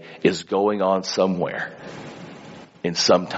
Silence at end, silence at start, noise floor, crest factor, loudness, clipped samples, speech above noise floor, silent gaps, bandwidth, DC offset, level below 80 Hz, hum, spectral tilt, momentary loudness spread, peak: 0 s; 0 s; -42 dBFS; 20 dB; -22 LUFS; under 0.1%; 21 dB; none; 8 kHz; under 0.1%; -64 dBFS; none; -3.5 dB/octave; 20 LU; -4 dBFS